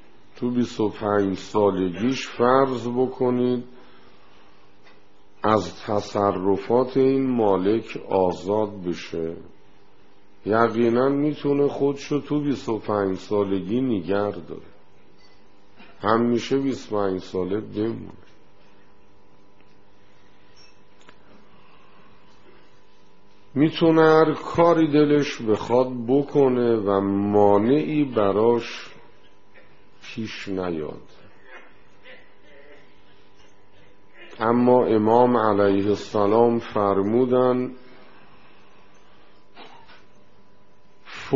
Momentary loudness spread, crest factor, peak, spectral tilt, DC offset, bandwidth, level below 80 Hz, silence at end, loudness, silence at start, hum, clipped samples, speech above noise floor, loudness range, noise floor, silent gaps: 12 LU; 22 dB; -2 dBFS; -6 dB/octave; 0.8%; 7.4 kHz; -60 dBFS; 0 s; -22 LUFS; 0.4 s; none; under 0.1%; 36 dB; 12 LU; -57 dBFS; none